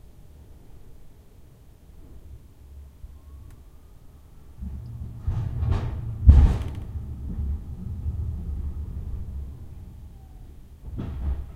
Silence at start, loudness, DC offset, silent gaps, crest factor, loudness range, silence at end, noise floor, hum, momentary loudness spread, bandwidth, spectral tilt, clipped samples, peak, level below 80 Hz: 0.05 s; -27 LUFS; under 0.1%; none; 26 dB; 17 LU; 0 s; -49 dBFS; none; 26 LU; 4.8 kHz; -9 dB/octave; under 0.1%; -2 dBFS; -28 dBFS